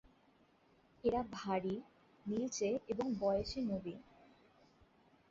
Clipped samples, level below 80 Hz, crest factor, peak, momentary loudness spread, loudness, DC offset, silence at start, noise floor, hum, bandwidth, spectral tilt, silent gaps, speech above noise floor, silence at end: under 0.1%; -64 dBFS; 18 dB; -22 dBFS; 10 LU; -39 LUFS; under 0.1%; 1.05 s; -70 dBFS; none; 7.6 kHz; -5.5 dB/octave; none; 32 dB; 1.3 s